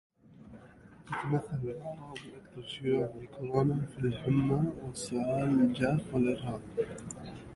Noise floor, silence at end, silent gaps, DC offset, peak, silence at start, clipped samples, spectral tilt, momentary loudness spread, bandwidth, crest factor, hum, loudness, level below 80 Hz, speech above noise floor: -55 dBFS; 0 s; none; under 0.1%; -14 dBFS; 0.3 s; under 0.1%; -7 dB/octave; 17 LU; 11.5 kHz; 20 dB; none; -32 LUFS; -58 dBFS; 23 dB